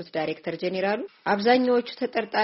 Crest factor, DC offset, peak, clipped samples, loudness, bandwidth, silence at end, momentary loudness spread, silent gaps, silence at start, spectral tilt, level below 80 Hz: 18 dB; under 0.1%; -8 dBFS; under 0.1%; -25 LUFS; 6 kHz; 0 s; 9 LU; none; 0 s; -3 dB/octave; -70 dBFS